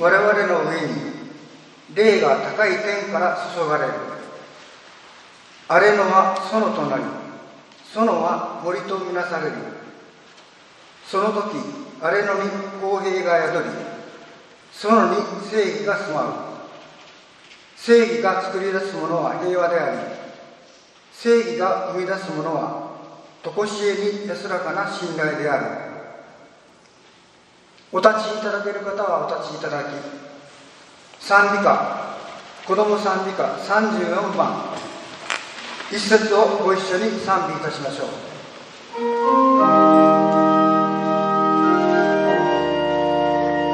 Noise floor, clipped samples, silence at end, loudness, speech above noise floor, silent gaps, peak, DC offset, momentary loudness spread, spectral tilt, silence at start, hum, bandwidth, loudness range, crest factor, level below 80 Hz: -52 dBFS; under 0.1%; 0 s; -20 LUFS; 32 dB; none; 0 dBFS; under 0.1%; 18 LU; -5 dB/octave; 0 s; none; 10 kHz; 9 LU; 20 dB; -62 dBFS